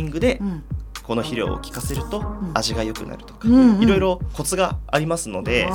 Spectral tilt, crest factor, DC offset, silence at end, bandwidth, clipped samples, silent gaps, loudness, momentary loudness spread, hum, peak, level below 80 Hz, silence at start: -5 dB/octave; 18 dB; under 0.1%; 0 s; 19 kHz; under 0.1%; none; -21 LUFS; 14 LU; none; -2 dBFS; -34 dBFS; 0 s